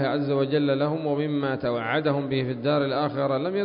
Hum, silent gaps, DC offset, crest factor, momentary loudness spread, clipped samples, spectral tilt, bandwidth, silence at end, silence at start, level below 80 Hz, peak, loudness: none; none; under 0.1%; 14 dB; 3 LU; under 0.1%; -11.5 dB/octave; 5.4 kHz; 0 s; 0 s; -62 dBFS; -10 dBFS; -25 LUFS